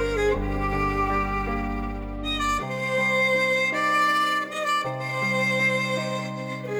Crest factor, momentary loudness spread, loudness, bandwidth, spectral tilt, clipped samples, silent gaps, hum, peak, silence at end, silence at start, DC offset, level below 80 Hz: 12 dB; 9 LU; -24 LUFS; over 20 kHz; -4.5 dB/octave; under 0.1%; none; none; -12 dBFS; 0 s; 0 s; under 0.1%; -36 dBFS